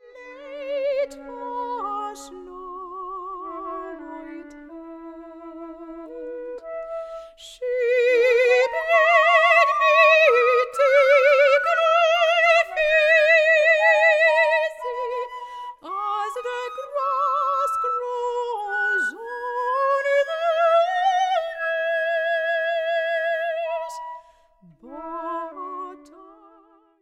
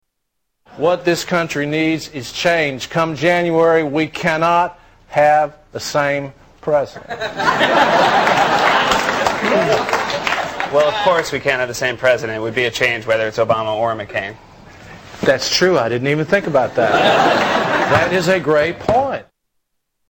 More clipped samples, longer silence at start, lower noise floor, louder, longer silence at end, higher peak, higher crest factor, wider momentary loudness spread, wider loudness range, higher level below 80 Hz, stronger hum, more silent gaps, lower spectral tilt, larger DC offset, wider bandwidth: neither; second, 0.15 s vs 0.7 s; second, -55 dBFS vs -72 dBFS; second, -19 LUFS vs -16 LUFS; second, 0.75 s vs 0.9 s; about the same, -4 dBFS vs -2 dBFS; about the same, 18 dB vs 14 dB; first, 23 LU vs 9 LU; first, 19 LU vs 3 LU; second, -62 dBFS vs -48 dBFS; neither; neither; second, -1 dB/octave vs -4 dB/octave; neither; second, 13 kHz vs 17 kHz